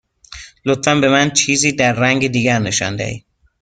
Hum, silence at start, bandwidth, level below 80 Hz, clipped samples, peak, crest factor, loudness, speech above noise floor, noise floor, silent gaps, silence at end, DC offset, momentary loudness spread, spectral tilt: none; 0.3 s; 10 kHz; -48 dBFS; under 0.1%; 0 dBFS; 16 dB; -15 LUFS; 23 dB; -38 dBFS; none; 0.45 s; under 0.1%; 13 LU; -3.5 dB/octave